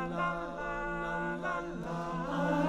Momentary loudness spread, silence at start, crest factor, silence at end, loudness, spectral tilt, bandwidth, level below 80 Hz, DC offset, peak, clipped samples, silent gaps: 4 LU; 0 s; 16 dB; 0 s; -36 LUFS; -7 dB/octave; 11.5 kHz; -50 dBFS; under 0.1%; -20 dBFS; under 0.1%; none